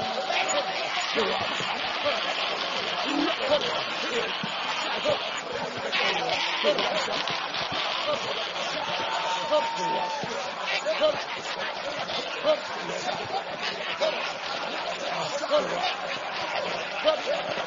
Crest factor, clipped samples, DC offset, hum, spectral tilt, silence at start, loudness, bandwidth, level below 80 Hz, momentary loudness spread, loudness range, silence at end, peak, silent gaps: 22 dB; under 0.1%; under 0.1%; none; -2 dB/octave; 0 s; -27 LUFS; 7.6 kHz; -66 dBFS; 6 LU; 3 LU; 0 s; -6 dBFS; none